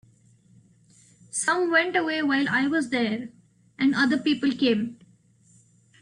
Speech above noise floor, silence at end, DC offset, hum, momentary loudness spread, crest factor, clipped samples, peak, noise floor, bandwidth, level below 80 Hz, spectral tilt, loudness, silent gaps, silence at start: 35 dB; 1.1 s; under 0.1%; none; 9 LU; 18 dB; under 0.1%; -8 dBFS; -59 dBFS; 11 kHz; -68 dBFS; -3.5 dB/octave; -24 LUFS; none; 1.35 s